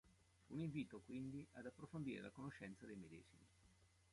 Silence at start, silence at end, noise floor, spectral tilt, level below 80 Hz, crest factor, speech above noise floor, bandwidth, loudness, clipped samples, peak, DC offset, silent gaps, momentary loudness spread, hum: 0.05 s; 0.05 s; -74 dBFS; -7 dB/octave; -78 dBFS; 18 dB; 22 dB; 11.5 kHz; -53 LUFS; under 0.1%; -36 dBFS; under 0.1%; none; 9 LU; none